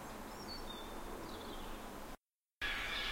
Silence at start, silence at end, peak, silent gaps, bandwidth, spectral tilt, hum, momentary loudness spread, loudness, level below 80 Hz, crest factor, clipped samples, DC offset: 0 s; 0 s; -26 dBFS; 2.35-2.39 s; 16 kHz; -3 dB/octave; none; 12 LU; -45 LUFS; -54 dBFS; 20 dB; under 0.1%; under 0.1%